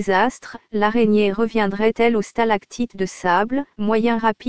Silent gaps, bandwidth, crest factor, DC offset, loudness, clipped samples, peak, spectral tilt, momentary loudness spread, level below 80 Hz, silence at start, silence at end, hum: none; 8 kHz; 16 dB; 2%; -20 LUFS; under 0.1%; -2 dBFS; -5.5 dB/octave; 8 LU; -50 dBFS; 0 s; 0 s; none